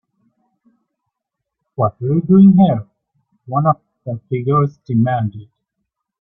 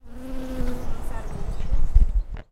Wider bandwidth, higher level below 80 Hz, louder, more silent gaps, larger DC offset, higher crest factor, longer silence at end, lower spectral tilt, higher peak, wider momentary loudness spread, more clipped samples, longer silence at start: second, 3.7 kHz vs 6.4 kHz; second, -54 dBFS vs -22 dBFS; first, -15 LUFS vs -29 LUFS; neither; neither; about the same, 16 dB vs 18 dB; first, 0.8 s vs 0.1 s; first, -12 dB/octave vs -7.5 dB/octave; about the same, -2 dBFS vs -4 dBFS; first, 15 LU vs 12 LU; neither; first, 1.8 s vs 0.05 s